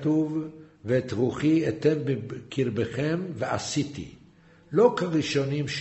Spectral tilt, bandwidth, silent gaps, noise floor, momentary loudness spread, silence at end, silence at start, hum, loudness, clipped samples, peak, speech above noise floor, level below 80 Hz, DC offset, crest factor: -6 dB/octave; 8.2 kHz; none; -55 dBFS; 12 LU; 0 s; 0 s; none; -26 LUFS; under 0.1%; -6 dBFS; 29 dB; -58 dBFS; under 0.1%; 20 dB